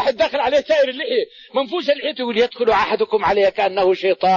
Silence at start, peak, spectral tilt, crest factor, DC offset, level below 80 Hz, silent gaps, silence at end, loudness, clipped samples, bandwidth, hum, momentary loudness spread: 0 s; -6 dBFS; -4.5 dB/octave; 12 dB; under 0.1%; -52 dBFS; none; 0 s; -18 LUFS; under 0.1%; 7.2 kHz; none; 5 LU